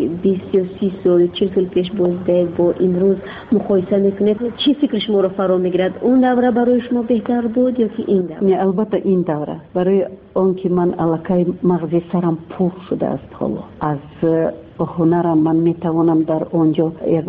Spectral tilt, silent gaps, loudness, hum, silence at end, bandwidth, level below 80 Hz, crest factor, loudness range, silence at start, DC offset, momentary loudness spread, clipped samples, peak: -7 dB/octave; none; -17 LUFS; none; 0 s; 5 kHz; -50 dBFS; 12 dB; 3 LU; 0 s; under 0.1%; 7 LU; under 0.1%; -4 dBFS